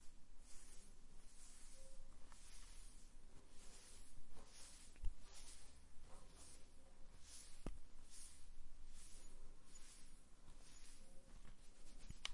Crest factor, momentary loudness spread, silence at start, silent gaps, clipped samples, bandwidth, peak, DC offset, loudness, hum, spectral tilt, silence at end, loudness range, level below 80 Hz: 24 dB; 10 LU; 0 s; none; under 0.1%; 11.5 kHz; -28 dBFS; under 0.1%; -63 LUFS; none; -2.5 dB/octave; 0 s; 4 LU; -58 dBFS